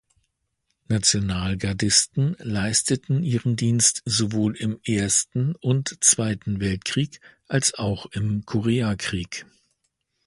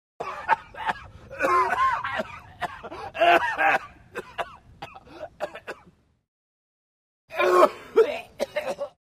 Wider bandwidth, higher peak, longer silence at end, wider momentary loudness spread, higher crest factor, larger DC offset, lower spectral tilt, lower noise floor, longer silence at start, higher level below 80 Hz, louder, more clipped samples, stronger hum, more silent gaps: second, 11.5 kHz vs 15.5 kHz; about the same, -2 dBFS vs -4 dBFS; first, 0.85 s vs 0.2 s; second, 9 LU vs 22 LU; about the same, 22 dB vs 24 dB; neither; about the same, -3.5 dB/octave vs -4 dB/octave; first, -75 dBFS vs -57 dBFS; first, 0.9 s vs 0.2 s; first, -46 dBFS vs -58 dBFS; about the same, -22 LUFS vs -24 LUFS; neither; neither; second, none vs 6.28-7.28 s